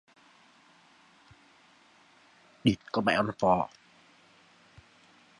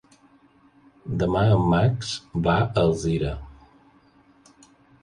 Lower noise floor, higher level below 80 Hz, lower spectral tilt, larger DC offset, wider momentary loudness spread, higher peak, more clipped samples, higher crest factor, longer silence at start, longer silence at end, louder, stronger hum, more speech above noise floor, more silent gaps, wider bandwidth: first, -61 dBFS vs -57 dBFS; second, -62 dBFS vs -42 dBFS; about the same, -6 dB/octave vs -7 dB/octave; neither; second, 3 LU vs 12 LU; about the same, -10 dBFS vs -8 dBFS; neither; first, 24 dB vs 16 dB; first, 2.65 s vs 1.05 s; first, 1.75 s vs 1.5 s; second, -28 LUFS vs -23 LUFS; neither; about the same, 34 dB vs 35 dB; neither; about the same, 11 kHz vs 11 kHz